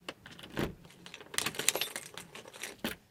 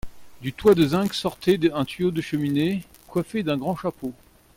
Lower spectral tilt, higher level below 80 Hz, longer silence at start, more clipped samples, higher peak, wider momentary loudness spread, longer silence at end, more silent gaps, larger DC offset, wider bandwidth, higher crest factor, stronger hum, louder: second, -1.5 dB/octave vs -6.5 dB/octave; second, -60 dBFS vs -50 dBFS; about the same, 0 s vs 0.05 s; neither; first, -2 dBFS vs -6 dBFS; first, 19 LU vs 13 LU; second, 0.1 s vs 0.45 s; neither; neither; about the same, 18 kHz vs 17 kHz; first, 38 dB vs 18 dB; neither; second, -36 LUFS vs -23 LUFS